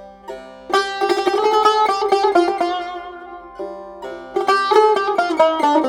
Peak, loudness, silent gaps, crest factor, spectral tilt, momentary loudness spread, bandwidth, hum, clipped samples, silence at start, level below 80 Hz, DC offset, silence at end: 0 dBFS; -17 LUFS; none; 18 dB; -3 dB/octave; 20 LU; 16.5 kHz; none; under 0.1%; 0 s; -56 dBFS; under 0.1%; 0 s